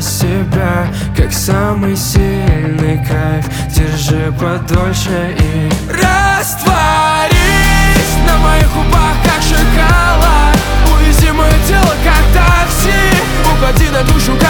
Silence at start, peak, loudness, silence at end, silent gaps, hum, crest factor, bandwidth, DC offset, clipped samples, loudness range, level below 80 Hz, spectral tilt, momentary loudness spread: 0 s; 0 dBFS; -11 LUFS; 0 s; none; none; 10 dB; 19.5 kHz; under 0.1%; under 0.1%; 4 LU; -14 dBFS; -5 dB/octave; 5 LU